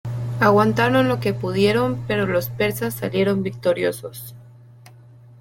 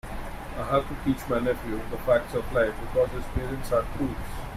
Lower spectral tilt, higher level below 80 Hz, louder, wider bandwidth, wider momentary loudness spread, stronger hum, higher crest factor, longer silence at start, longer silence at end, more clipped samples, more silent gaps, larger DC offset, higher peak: about the same, -6 dB/octave vs -6.5 dB/octave; second, -50 dBFS vs -38 dBFS; first, -20 LUFS vs -28 LUFS; about the same, 17 kHz vs 16 kHz; about the same, 11 LU vs 10 LU; neither; about the same, 18 dB vs 18 dB; about the same, 0.05 s vs 0.05 s; first, 0.9 s vs 0 s; neither; neither; neither; first, -2 dBFS vs -10 dBFS